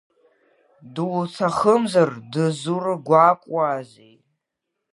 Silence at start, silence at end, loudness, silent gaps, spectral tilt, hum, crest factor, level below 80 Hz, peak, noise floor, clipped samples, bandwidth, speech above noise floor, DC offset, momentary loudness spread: 0.85 s; 1.05 s; -20 LUFS; none; -6.5 dB/octave; none; 20 dB; -66 dBFS; -2 dBFS; -80 dBFS; under 0.1%; 11.5 kHz; 60 dB; under 0.1%; 10 LU